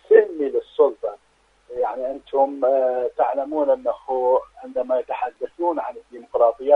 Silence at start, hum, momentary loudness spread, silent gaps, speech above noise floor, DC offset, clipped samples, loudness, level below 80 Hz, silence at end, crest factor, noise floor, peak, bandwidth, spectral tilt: 0.1 s; none; 10 LU; none; 40 dB; under 0.1%; under 0.1%; -22 LUFS; -62 dBFS; 0 s; 20 dB; -61 dBFS; -2 dBFS; 4.2 kHz; -6 dB/octave